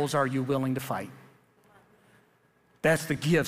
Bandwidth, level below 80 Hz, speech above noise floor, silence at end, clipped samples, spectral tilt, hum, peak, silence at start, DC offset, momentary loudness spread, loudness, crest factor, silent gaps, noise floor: 15.5 kHz; -64 dBFS; 38 dB; 0 s; under 0.1%; -5.5 dB/octave; none; -10 dBFS; 0 s; under 0.1%; 9 LU; -28 LUFS; 20 dB; none; -65 dBFS